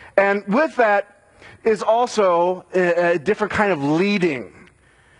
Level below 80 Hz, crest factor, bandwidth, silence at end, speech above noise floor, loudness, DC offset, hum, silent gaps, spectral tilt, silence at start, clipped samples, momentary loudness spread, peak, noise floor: -58 dBFS; 18 dB; 11 kHz; 0.7 s; 35 dB; -19 LUFS; under 0.1%; none; none; -6 dB/octave; 0 s; under 0.1%; 5 LU; 0 dBFS; -54 dBFS